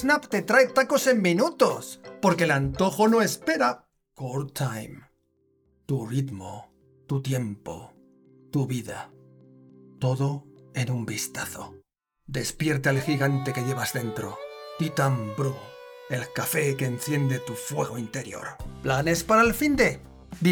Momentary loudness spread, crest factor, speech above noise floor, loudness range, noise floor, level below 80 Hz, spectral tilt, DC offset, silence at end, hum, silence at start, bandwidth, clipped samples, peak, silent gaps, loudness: 18 LU; 22 dB; 43 dB; 10 LU; -68 dBFS; -52 dBFS; -5 dB/octave; under 0.1%; 0 s; none; 0 s; over 20 kHz; under 0.1%; -6 dBFS; none; -26 LUFS